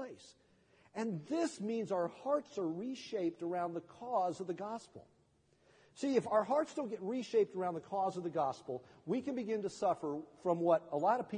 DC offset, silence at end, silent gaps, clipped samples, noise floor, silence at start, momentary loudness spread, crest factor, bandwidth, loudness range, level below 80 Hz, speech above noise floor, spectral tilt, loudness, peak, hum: under 0.1%; 0 s; none; under 0.1%; -72 dBFS; 0 s; 11 LU; 20 dB; 10 kHz; 4 LU; -82 dBFS; 35 dB; -6 dB/octave; -37 LUFS; -18 dBFS; none